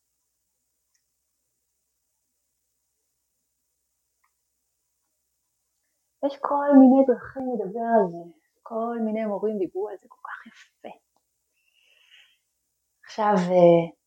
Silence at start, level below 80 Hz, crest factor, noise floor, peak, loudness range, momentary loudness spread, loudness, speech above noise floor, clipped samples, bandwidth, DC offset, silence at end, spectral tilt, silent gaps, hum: 6.2 s; -74 dBFS; 22 dB; -76 dBFS; -4 dBFS; 15 LU; 24 LU; -22 LUFS; 55 dB; under 0.1%; 7.6 kHz; under 0.1%; 0.15 s; -8.5 dB/octave; none; none